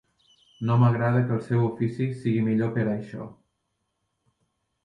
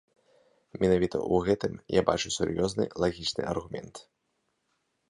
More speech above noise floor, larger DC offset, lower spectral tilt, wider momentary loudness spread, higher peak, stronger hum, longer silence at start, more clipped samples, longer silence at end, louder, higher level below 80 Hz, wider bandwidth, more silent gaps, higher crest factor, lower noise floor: first, 54 dB vs 49 dB; neither; first, -9.5 dB/octave vs -5 dB/octave; second, 12 LU vs 15 LU; about the same, -8 dBFS vs -6 dBFS; neither; second, 0.6 s vs 0.75 s; neither; first, 1.5 s vs 1.1 s; first, -25 LUFS vs -28 LUFS; second, -62 dBFS vs -52 dBFS; second, 5.2 kHz vs 11 kHz; neither; second, 18 dB vs 24 dB; about the same, -77 dBFS vs -77 dBFS